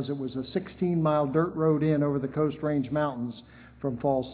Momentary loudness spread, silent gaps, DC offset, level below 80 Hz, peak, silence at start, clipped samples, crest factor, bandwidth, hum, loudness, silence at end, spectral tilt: 10 LU; none; under 0.1%; -56 dBFS; -12 dBFS; 0 s; under 0.1%; 16 dB; 4 kHz; none; -28 LUFS; 0 s; -12 dB/octave